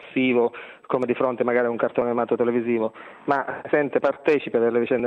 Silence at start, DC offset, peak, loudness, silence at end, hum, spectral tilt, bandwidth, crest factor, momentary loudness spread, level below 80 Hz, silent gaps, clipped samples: 0 s; under 0.1%; -4 dBFS; -23 LUFS; 0 s; none; -8 dB/octave; 5.6 kHz; 18 dB; 5 LU; -68 dBFS; none; under 0.1%